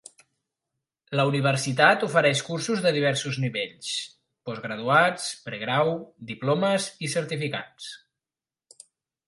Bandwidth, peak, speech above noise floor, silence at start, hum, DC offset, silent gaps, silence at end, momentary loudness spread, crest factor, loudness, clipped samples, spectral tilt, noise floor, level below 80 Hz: 11.5 kHz; -2 dBFS; over 65 dB; 1.1 s; none; under 0.1%; none; 1.3 s; 15 LU; 24 dB; -25 LUFS; under 0.1%; -4.5 dB/octave; under -90 dBFS; -72 dBFS